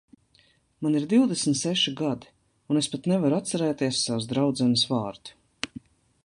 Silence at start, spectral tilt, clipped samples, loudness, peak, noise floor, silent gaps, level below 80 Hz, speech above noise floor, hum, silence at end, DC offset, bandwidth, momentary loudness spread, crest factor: 0.8 s; -4.5 dB/octave; under 0.1%; -25 LUFS; -8 dBFS; -63 dBFS; none; -64 dBFS; 38 dB; none; 0.6 s; under 0.1%; 11.5 kHz; 14 LU; 18 dB